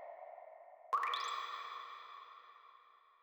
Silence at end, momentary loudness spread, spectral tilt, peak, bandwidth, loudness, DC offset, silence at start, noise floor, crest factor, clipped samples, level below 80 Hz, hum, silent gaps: 0.1 s; 22 LU; 2 dB/octave; -24 dBFS; over 20 kHz; -42 LUFS; under 0.1%; 0 s; -65 dBFS; 20 dB; under 0.1%; under -90 dBFS; none; none